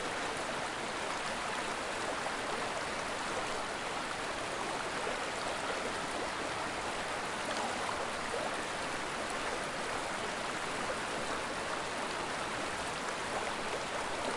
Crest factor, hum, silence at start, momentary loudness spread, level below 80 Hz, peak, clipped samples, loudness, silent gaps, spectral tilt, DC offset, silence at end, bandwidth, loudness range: 14 dB; none; 0 s; 1 LU; -60 dBFS; -22 dBFS; under 0.1%; -36 LUFS; none; -2.5 dB/octave; under 0.1%; 0 s; 11.5 kHz; 0 LU